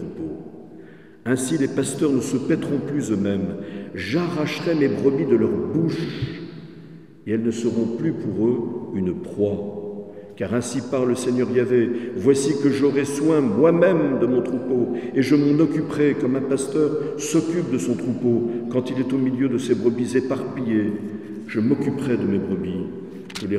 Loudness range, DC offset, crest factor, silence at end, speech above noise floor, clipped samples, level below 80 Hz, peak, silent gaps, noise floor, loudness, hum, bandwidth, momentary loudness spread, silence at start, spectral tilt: 6 LU; 0.2%; 18 dB; 0 s; 23 dB; under 0.1%; -60 dBFS; -4 dBFS; none; -44 dBFS; -22 LUFS; none; 13.5 kHz; 12 LU; 0 s; -6.5 dB/octave